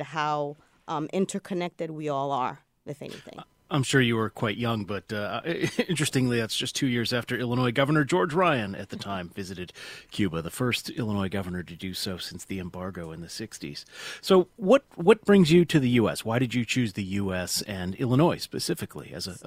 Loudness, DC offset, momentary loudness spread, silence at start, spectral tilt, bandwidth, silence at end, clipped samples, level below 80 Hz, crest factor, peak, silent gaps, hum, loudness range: -26 LUFS; under 0.1%; 15 LU; 0 s; -5.5 dB/octave; 16 kHz; 0.05 s; under 0.1%; -58 dBFS; 20 dB; -6 dBFS; none; none; 9 LU